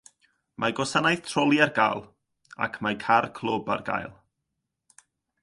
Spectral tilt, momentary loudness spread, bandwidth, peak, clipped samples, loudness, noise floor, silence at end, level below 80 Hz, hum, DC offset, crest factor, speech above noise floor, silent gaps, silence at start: -4.5 dB/octave; 11 LU; 11.5 kHz; -6 dBFS; under 0.1%; -25 LUFS; -82 dBFS; 1.3 s; -64 dBFS; none; under 0.1%; 22 dB; 57 dB; none; 0.6 s